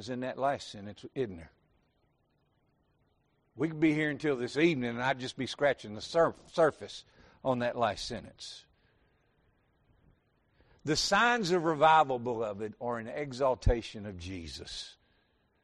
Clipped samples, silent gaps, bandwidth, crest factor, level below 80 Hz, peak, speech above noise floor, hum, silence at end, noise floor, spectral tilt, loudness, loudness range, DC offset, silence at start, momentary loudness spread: under 0.1%; none; 11.5 kHz; 20 dB; -48 dBFS; -12 dBFS; 42 dB; none; 0.7 s; -73 dBFS; -5 dB/octave; -31 LUFS; 10 LU; under 0.1%; 0 s; 17 LU